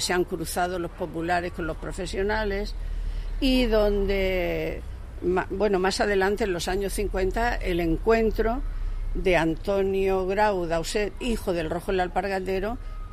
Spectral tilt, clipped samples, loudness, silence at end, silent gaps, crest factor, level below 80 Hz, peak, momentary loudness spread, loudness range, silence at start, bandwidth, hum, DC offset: -5 dB/octave; under 0.1%; -26 LUFS; 0 s; none; 16 dB; -32 dBFS; -8 dBFS; 10 LU; 2 LU; 0 s; 15.5 kHz; none; under 0.1%